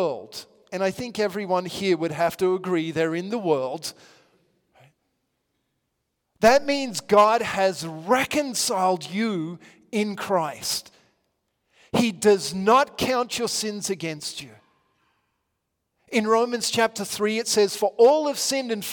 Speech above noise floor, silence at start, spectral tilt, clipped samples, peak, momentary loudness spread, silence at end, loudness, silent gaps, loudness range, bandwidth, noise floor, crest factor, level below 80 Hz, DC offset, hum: 55 dB; 0 s; -3.5 dB/octave; under 0.1%; -6 dBFS; 12 LU; 0 s; -23 LUFS; none; 7 LU; 18 kHz; -78 dBFS; 18 dB; -62 dBFS; under 0.1%; none